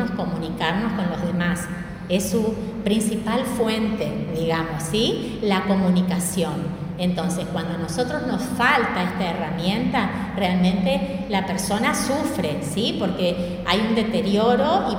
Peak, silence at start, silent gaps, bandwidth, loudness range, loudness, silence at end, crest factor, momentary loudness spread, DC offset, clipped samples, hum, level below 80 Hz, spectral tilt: -4 dBFS; 0 s; none; 16.5 kHz; 2 LU; -22 LUFS; 0 s; 18 dB; 6 LU; under 0.1%; under 0.1%; none; -44 dBFS; -5 dB/octave